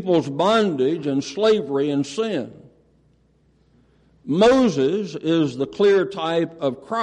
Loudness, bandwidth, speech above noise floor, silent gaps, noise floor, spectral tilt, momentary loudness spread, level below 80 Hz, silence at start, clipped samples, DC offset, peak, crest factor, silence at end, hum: -20 LUFS; 10 kHz; 40 dB; none; -60 dBFS; -6 dB/octave; 9 LU; -56 dBFS; 0 s; under 0.1%; under 0.1%; -6 dBFS; 16 dB; 0 s; none